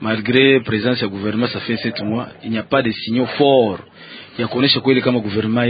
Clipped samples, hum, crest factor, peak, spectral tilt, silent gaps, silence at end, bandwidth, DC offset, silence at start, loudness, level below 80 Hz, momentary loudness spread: under 0.1%; none; 18 dB; 0 dBFS; -9.5 dB/octave; none; 0 s; 5 kHz; under 0.1%; 0 s; -17 LUFS; -52 dBFS; 11 LU